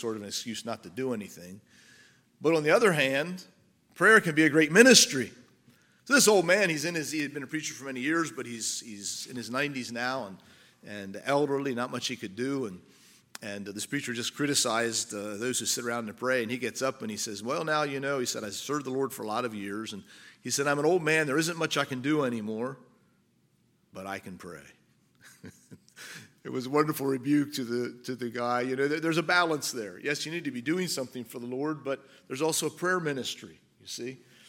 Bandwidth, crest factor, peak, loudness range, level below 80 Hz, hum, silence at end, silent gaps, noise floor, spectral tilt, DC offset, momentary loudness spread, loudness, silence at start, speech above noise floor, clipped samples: 17 kHz; 26 dB; -4 dBFS; 11 LU; -78 dBFS; none; 0.3 s; none; -68 dBFS; -3 dB/octave; under 0.1%; 17 LU; -28 LUFS; 0 s; 39 dB; under 0.1%